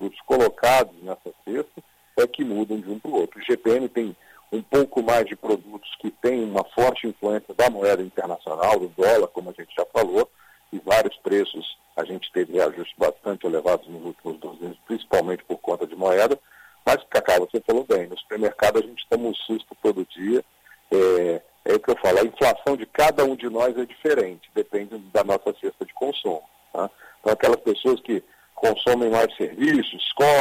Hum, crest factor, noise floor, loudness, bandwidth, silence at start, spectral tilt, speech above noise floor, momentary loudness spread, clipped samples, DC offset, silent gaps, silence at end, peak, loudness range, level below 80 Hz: none; 18 dB; -54 dBFS; -23 LUFS; 16 kHz; 0 s; -4.5 dB/octave; 32 dB; 12 LU; under 0.1%; under 0.1%; none; 0 s; -6 dBFS; 4 LU; -56 dBFS